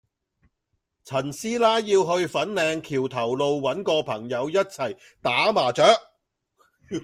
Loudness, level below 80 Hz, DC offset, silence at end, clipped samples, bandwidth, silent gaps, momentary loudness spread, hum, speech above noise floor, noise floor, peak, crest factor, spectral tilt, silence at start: -23 LUFS; -64 dBFS; under 0.1%; 0 s; under 0.1%; 15 kHz; none; 10 LU; none; 54 dB; -77 dBFS; -2 dBFS; 22 dB; -4 dB/octave; 1.05 s